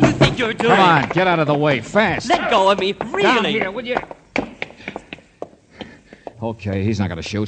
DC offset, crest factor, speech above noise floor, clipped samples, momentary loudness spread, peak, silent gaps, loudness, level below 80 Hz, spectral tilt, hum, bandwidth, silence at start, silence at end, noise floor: under 0.1%; 18 dB; 22 dB; under 0.1%; 23 LU; 0 dBFS; none; -17 LUFS; -44 dBFS; -5.5 dB/octave; none; 9.4 kHz; 0 s; 0 s; -39 dBFS